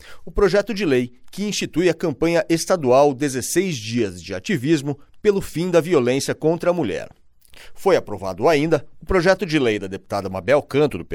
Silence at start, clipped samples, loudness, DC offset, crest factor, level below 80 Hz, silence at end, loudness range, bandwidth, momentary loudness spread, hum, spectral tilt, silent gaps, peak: 0.05 s; under 0.1%; -20 LUFS; under 0.1%; 16 dB; -42 dBFS; 0 s; 1 LU; 17 kHz; 9 LU; none; -5 dB/octave; none; -4 dBFS